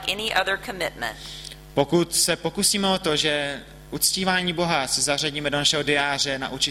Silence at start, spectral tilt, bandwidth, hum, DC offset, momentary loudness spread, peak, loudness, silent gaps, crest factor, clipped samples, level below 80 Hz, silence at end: 0 s; -2.5 dB/octave; 16 kHz; none; under 0.1%; 11 LU; -6 dBFS; -22 LUFS; none; 18 dB; under 0.1%; -48 dBFS; 0 s